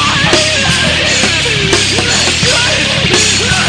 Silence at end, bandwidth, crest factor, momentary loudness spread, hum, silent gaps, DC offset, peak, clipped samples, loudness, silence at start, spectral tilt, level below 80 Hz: 0 s; 11 kHz; 10 dB; 1 LU; none; none; under 0.1%; 0 dBFS; 0.2%; -9 LUFS; 0 s; -2 dB/octave; -30 dBFS